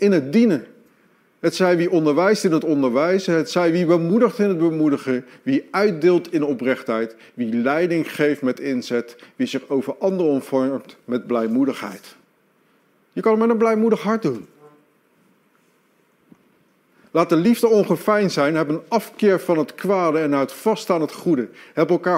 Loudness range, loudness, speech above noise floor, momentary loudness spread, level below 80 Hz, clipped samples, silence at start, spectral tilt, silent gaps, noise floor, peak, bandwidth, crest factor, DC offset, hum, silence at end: 5 LU; -20 LUFS; 42 dB; 8 LU; -70 dBFS; under 0.1%; 0 s; -6.5 dB/octave; none; -61 dBFS; -4 dBFS; 16 kHz; 16 dB; under 0.1%; none; 0 s